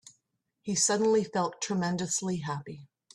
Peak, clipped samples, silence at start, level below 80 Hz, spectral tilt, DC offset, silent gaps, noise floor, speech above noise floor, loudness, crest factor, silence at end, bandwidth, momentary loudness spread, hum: -12 dBFS; under 0.1%; 0.65 s; -70 dBFS; -4 dB/octave; under 0.1%; none; -78 dBFS; 49 dB; -29 LUFS; 18 dB; 0.3 s; 13 kHz; 16 LU; none